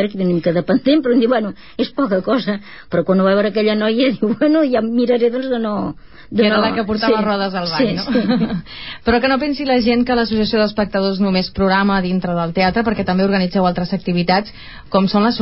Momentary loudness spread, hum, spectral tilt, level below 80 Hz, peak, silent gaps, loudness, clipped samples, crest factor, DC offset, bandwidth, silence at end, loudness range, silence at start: 7 LU; none; -10.5 dB/octave; -42 dBFS; -2 dBFS; none; -17 LUFS; under 0.1%; 14 dB; 0.8%; 5.8 kHz; 0 s; 1 LU; 0 s